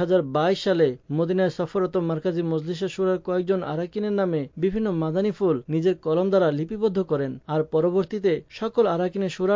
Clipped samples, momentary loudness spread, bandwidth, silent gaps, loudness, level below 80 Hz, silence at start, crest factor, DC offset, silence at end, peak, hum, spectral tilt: under 0.1%; 5 LU; 7.6 kHz; none; -24 LUFS; -56 dBFS; 0 s; 14 dB; under 0.1%; 0 s; -10 dBFS; none; -7.5 dB/octave